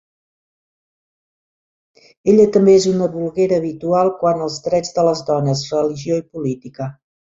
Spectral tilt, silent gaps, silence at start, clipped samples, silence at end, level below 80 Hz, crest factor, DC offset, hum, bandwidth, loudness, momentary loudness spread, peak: -6.5 dB/octave; none; 2.25 s; under 0.1%; 0.3 s; -56 dBFS; 16 dB; under 0.1%; none; 7.8 kHz; -17 LUFS; 13 LU; -2 dBFS